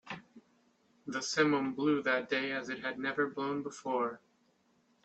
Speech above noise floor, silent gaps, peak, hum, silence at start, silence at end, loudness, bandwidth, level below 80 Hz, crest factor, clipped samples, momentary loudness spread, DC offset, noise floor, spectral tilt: 38 dB; none; -14 dBFS; none; 0.05 s; 0.85 s; -33 LUFS; 8.6 kHz; -76 dBFS; 20 dB; under 0.1%; 14 LU; under 0.1%; -72 dBFS; -4 dB/octave